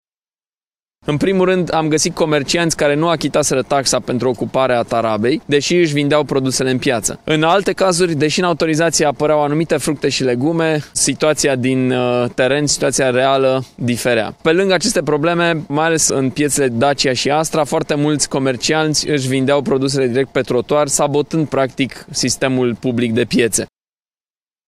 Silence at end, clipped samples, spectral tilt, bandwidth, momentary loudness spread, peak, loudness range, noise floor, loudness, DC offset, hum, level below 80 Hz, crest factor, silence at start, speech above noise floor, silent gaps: 1 s; under 0.1%; -4 dB/octave; 15.5 kHz; 4 LU; 0 dBFS; 1 LU; under -90 dBFS; -15 LUFS; under 0.1%; none; -46 dBFS; 14 dB; 1.05 s; over 75 dB; none